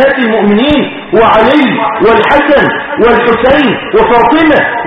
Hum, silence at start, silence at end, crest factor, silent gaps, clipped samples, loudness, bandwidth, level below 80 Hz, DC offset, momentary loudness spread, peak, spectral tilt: none; 0 s; 0 s; 6 dB; none; 0.4%; -7 LUFS; 6.6 kHz; -32 dBFS; under 0.1%; 4 LU; 0 dBFS; -7 dB/octave